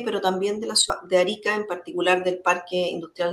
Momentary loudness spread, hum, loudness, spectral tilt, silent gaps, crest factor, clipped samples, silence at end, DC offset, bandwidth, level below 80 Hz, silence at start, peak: 7 LU; none; -23 LUFS; -2.5 dB/octave; none; 20 dB; under 0.1%; 0 s; under 0.1%; 12.5 kHz; -60 dBFS; 0 s; -4 dBFS